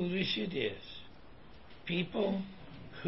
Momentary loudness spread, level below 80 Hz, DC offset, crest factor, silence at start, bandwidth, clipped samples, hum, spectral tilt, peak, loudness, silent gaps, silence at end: 23 LU; -60 dBFS; 0.2%; 18 dB; 0 s; 5.8 kHz; under 0.1%; none; -4 dB/octave; -20 dBFS; -35 LUFS; none; 0 s